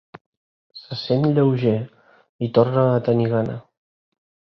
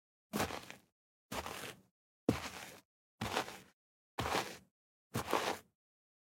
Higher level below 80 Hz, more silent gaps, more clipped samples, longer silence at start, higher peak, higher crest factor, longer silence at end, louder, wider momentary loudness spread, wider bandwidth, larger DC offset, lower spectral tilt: first, -58 dBFS vs -64 dBFS; second, 2.29-2.39 s vs 0.92-1.29 s, 1.91-2.27 s, 2.85-3.18 s, 3.73-4.18 s, 4.71-5.10 s; neither; first, 0.75 s vs 0.35 s; first, -2 dBFS vs -16 dBFS; second, 18 dB vs 28 dB; first, 0.9 s vs 0.65 s; first, -20 LUFS vs -41 LUFS; second, 14 LU vs 18 LU; second, 6 kHz vs 16.5 kHz; neither; first, -10 dB/octave vs -4 dB/octave